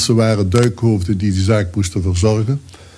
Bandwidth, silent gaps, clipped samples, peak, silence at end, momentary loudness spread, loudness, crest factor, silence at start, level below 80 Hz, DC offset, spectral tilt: 11 kHz; none; under 0.1%; -2 dBFS; 0.15 s; 5 LU; -16 LUFS; 12 dB; 0 s; -36 dBFS; under 0.1%; -6 dB/octave